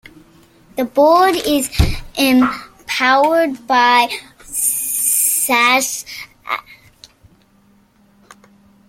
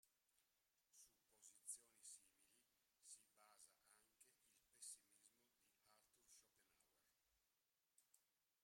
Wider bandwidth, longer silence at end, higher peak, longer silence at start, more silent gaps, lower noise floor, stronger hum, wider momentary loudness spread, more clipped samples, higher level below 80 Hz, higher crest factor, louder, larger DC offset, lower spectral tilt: about the same, 16.5 kHz vs 16 kHz; first, 2.15 s vs 0 s; first, 0 dBFS vs -42 dBFS; first, 0.75 s vs 0.05 s; neither; second, -53 dBFS vs under -90 dBFS; neither; first, 13 LU vs 9 LU; neither; first, -34 dBFS vs under -90 dBFS; second, 16 dB vs 30 dB; first, -15 LUFS vs -61 LUFS; neither; first, -3 dB/octave vs 1.5 dB/octave